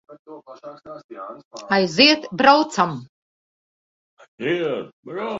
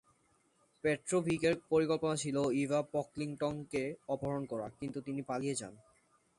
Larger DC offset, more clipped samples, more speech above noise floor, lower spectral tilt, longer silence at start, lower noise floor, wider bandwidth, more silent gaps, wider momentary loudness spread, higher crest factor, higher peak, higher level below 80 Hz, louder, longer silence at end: neither; neither; first, over 69 dB vs 38 dB; second, -4 dB/octave vs -5.5 dB/octave; second, 0.1 s vs 0.85 s; first, under -90 dBFS vs -73 dBFS; second, 8 kHz vs 11.5 kHz; first, 0.19-0.25 s, 1.04-1.09 s, 1.45-1.51 s, 3.09-4.17 s, 4.28-4.38 s, 4.93-5.03 s vs none; first, 25 LU vs 10 LU; about the same, 22 dB vs 18 dB; first, 0 dBFS vs -18 dBFS; about the same, -64 dBFS vs -68 dBFS; first, -18 LUFS vs -36 LUFS; second, 0 s vs 0.6 s